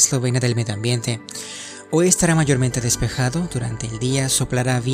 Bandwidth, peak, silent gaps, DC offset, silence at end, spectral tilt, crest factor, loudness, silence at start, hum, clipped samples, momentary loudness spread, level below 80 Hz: 16 kHz; 0 dBFS; none; under 0.1%; 0 s; -4 dB/octave; 20 dB; -20 LUFS; 0 s; none; under 0.1%; 12 LU; -40 dBFS